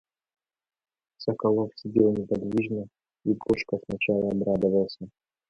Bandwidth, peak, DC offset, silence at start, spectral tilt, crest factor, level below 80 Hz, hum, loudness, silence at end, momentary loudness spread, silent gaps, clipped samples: 7.6 kHz; -8 dBFS; under 0.1%; 1.2 s; -8 dB/octave; 20 dB; -58 dBFS; none; -27 LUFS; 0.4 s; 10 LU; none; under 0.1%